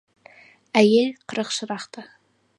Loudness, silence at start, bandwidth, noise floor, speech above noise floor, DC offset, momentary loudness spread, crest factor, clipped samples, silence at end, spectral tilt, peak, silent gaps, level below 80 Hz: -22 LUFS; 0.75 s; 11.5 kHz; -51 dBFS; 30 dB; under 0.1%; 19 LU; 24 dB; under 0.1%; 0.55 s; -4.5 dB/octave; 0 dBFS; none; -72 dBFS